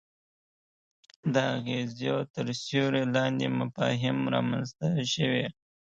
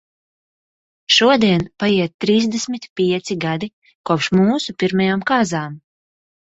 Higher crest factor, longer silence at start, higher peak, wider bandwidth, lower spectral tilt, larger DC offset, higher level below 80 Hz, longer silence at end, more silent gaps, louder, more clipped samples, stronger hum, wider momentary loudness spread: about the same, 20 dB vs 18 dB; first, 1.25 s vs 1.1 s; second, -10 dBFS vs -2 dBFS; about the same, 8 kHz vs 8 kHz; about the same, -5.5 dB/octave vs -5 dB/octave; neither; second, -66 dBFS vs -54 dBFS; second, 0.4 s vs 0.7 s; second, 2.30-2.34 s vs 2.14-2.19 s, 2.89-2.96 s, 3.73-3.82 s, 3.95-4.04 s; second, -29 LUFS vs -17 LUFS; neither; neither; second, 5 LU vs 12 LU